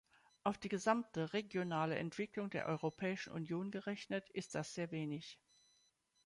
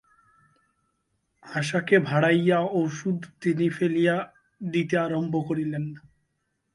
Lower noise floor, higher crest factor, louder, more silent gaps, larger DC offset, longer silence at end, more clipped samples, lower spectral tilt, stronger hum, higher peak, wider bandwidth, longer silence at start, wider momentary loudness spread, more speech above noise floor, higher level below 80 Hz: about the same, -78 dBFS vs -76 dBFS; about the same, 22 dB vs 20 dB; second, -42 LUFS vs -25 LUFS; neither; neither; first, 0.9 s vs 0.75 s; neither; about the same, -5.5 dB/octave vs -6.5 dB/octave; neither; second, -20 dBFS vs -6 dBFS; about the same, 11.5 kHz vs 11.5 kHz; second, 0.45 s vs 1.45 s; second, 7 LU vs 11 LU; second, 36 dB vs 52 dB; second, -78 dBFS vs -68 dBFS